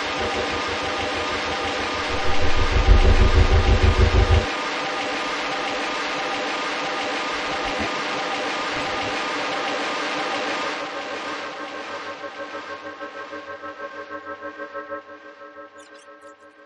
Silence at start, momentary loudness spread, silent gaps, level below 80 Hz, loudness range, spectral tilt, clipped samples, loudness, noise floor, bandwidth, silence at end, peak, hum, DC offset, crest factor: 0 s; 16 LU; none; -26 dBFS; 14 LU; -4.5 dB/octave; under 0.1%; -23 LUFS; -46 dBFS; 10 kHz; 0.15 s; -2 dBFS; none; under 0.1%; 20 dB